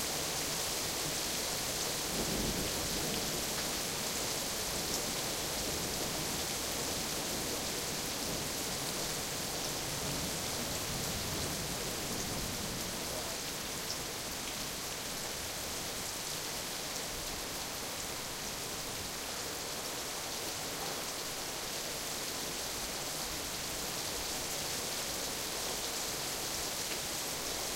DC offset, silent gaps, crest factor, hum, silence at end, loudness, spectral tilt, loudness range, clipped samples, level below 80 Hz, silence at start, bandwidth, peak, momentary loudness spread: under 0.1%; none; 20 dB; none; 0 s; -35 LUFS; -1.5 dB/octave; 4 LU; under 0.1%; -54 dBFS; 0 s; 16 kHz; -18 dBFS; 4 LU